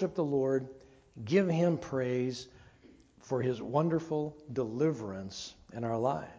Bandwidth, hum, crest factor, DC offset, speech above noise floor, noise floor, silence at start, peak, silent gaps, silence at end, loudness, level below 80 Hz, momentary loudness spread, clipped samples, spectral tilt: 8 kHz; none; 20 dB; under 0.1%; 28 dB; -60 dBFS; 0 s; -14 dBFS; none; 0 s; -32 LUFS; -64 dBFS; 14 LU; under 0.1%; -7 dB/octave